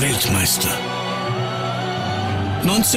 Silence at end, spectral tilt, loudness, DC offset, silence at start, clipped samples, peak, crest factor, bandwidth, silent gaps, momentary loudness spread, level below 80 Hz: 0 s; -3.5 dB/octave; -20 LUFS; under 0.1%; 0 s; under 0.1%; -6 dBFS; 14 dB; 16 kHz; none; 7 LU; -46 dBFS